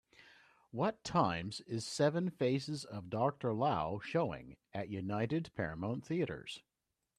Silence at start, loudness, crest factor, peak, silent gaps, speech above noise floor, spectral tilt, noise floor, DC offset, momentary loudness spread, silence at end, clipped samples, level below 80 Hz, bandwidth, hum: 0.75 s; -37 LUFS; 20 dB; -18 dBFS; none; 28 dB; -6 dB/octave; -65 dBFS; under 0.1%; 11 LU; 0.6 s; under 0.1%; -68 dBFS; 13.5 kHz; none